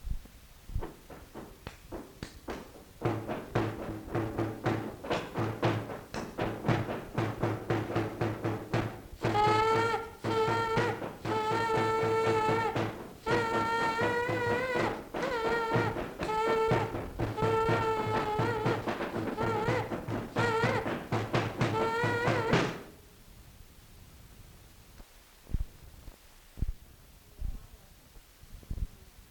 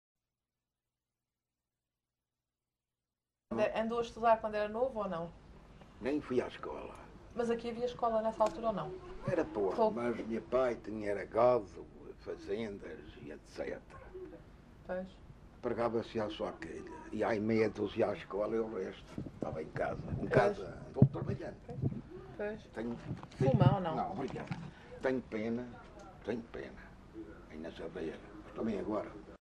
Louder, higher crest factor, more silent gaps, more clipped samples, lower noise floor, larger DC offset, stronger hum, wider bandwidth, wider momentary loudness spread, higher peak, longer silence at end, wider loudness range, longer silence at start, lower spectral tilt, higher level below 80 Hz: first, -32 LUFS vs -36 LUFS; about the same, 22 dB vs 26 dB; neither; neither; second, -55 dBFS vs under -90 dBFS; neither; neither; first, 19 kHz vs 10.5 kHz; second, 16 LU vs 19 LU; about the same, -12 dBFS vs -10 dBFS; about the same, 0.05 s vs 0.1 s; first, 16 LU vs 8 LU; second, 0 s vs 3.5 s; second, -6 dB/octave vs -8 dB/octave; first, -48 dBFS vs -58 dBFS